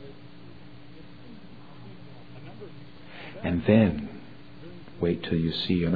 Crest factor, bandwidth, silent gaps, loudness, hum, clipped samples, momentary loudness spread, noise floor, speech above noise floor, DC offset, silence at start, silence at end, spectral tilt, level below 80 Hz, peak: 22 dB; 5 kHz; none; -26 LUFS; none; under 0.1%; 26 LU; -48 dBFS; 24 dB; 0.5%; 0 s; 0 s; -9.5 dB/octave; -52 dBFS; -6 dBFS